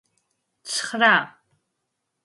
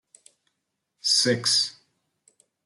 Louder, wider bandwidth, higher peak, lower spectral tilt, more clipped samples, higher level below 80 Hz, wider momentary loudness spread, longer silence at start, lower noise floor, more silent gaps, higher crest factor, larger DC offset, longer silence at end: about the same, -20 LUFS vs -22 LUFS; about the same, 11.5 kHz vs 12.5 kHz; first, -4 dBFS vs -10 dBFS; about the same, -2 dB/octave vs -2 dB/octave; neither; about the same, -78 dBFS vs -76 dBFS; first, 21 LU vs 9 LU; second, 0.65 s vs 1.05 s; about the same, -78 dBFS vs -80 dBFS; neither; about the same, 22 dB vs 18 dB; neither; about the same, 0.95 s vs 0.95 s